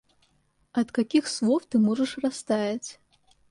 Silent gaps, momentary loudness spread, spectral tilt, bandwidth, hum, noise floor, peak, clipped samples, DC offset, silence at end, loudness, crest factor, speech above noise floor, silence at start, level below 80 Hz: none; 8 LU; -5 dB/octave; 11.5 kHz; none; -68 dBFS; -10 dBFS; under 0.1%; under 0.1%; 0.6 s; -26 LUFS; 16 dB; 43 dB; 0.75 s; -68 dBFS